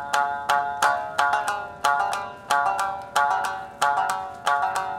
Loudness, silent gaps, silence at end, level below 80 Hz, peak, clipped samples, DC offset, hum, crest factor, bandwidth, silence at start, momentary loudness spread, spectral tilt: -24 LUFS; none; 0 s; -60 dBFS; -6 dBFS; under 0.1%; under 0.1%; none; 18 dB; 17 kHz; 0 s; 5 LU; -1 dB/octave